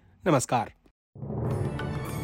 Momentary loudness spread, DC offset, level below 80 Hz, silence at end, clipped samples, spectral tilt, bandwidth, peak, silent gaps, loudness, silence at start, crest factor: 13 LU; under 0.1%; -48 dBFS; 0 s; under 0.1%; -6 dB/octave; 16 kHz; -10 dBFS; 0.91-1.13 s; -29 LUFS; 0.25 s; 18 dB